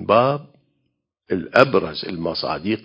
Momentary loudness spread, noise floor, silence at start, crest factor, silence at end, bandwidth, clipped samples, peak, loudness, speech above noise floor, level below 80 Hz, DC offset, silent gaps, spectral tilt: 12 LU; -73 dBFS; 0 s; 20 dB; 0.05 s; 8 kHz; under 0.1%; 0 dBFS; -20 LUFS; 54 dB; -52 dBFS; under 0.1%; none; -7 dB/octave